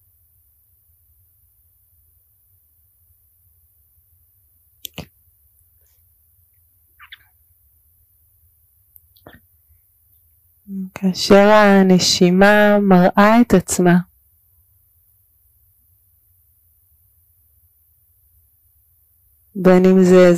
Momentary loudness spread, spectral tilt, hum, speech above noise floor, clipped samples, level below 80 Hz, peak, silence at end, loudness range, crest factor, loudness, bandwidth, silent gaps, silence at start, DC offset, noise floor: 24 LU; -5.5 dB/octave; none; 46 dB; under 0.1%; -50 dBFS; -2 dBFS; 0 s; 13 LU; 16 dB; -12 LUFS; 15.5 kHz; none; 5 s; under 0.1%; -58 dBFS